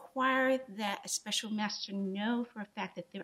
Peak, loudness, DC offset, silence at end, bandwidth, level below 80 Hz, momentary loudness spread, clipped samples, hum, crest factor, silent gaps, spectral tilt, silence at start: -18 dBFS; -34 LUFS; under 0.1%; 0 s; 15.5 kHz; -84 dBFS; 11 LU; under 0.1%; none; 18 dB; none; -3 dB/octave; 0 s